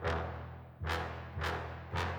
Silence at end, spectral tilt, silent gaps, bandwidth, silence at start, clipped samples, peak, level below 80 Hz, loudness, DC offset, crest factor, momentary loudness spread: 0 s; -5.5 dB/octave; none; 20 kHz; 0 s; under 0.1%; -22 dBFS; -48 dBFS; -40 LUFS; under 0.1%; 16 dB; 7 LU